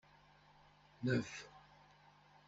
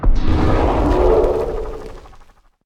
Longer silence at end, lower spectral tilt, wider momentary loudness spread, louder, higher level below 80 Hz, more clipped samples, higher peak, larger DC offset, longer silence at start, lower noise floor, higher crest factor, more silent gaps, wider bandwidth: first, 0.9 s vs 0.6 s; second, -6 dB/octave vs -8 dB/octave; first, 27 LU vs 16 LU; second, -41 LUFS vs -17 LUFS; second, -74 dBFS vs -20 dBFS; neither; second, -24 dBFS vs -2 dBFS; neither; first, 1 s vs 0 s; first, -67 dBFS vs -45 dBFS; first, 22 dB vs 14 dB; neither; about the same, 8 kHz vs 7.8 kHz